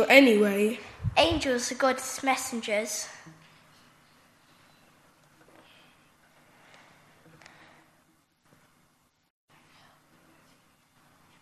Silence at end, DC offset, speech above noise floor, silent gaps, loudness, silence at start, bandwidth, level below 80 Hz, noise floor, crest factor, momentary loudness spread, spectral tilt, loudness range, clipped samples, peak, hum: 8.1 s; under 0.1%; 44 dB; none; -25 LUFS; 0 s; 13 kHz; -56 dBFS; -68 dBFS; 26 dB; 15 LU; -3.5 dB/octave; 13 LU; under 0.1%; -4 dBFS; none